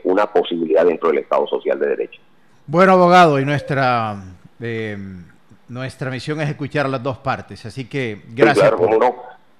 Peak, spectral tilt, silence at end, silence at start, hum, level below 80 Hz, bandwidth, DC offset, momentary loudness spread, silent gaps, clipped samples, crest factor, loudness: 0 dBFS; -6.5 dB/octave; 0.25 s; 0.05 s; none; -58 dBFS; 12.5 kHz; 0.3%; 18 LU; none; under 0.1%; 16 dB; -17 LUFS